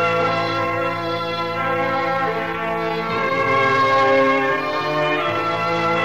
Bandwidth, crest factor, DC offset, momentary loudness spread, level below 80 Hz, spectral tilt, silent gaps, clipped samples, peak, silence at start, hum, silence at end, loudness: 15 kHz; 12 dB; 0.6%; 7 LU; -54 dBFS; -5.5 dB/octave; none; under 0.1%; -6 dBFS; 0 s; none; 0 s; -19 LUFS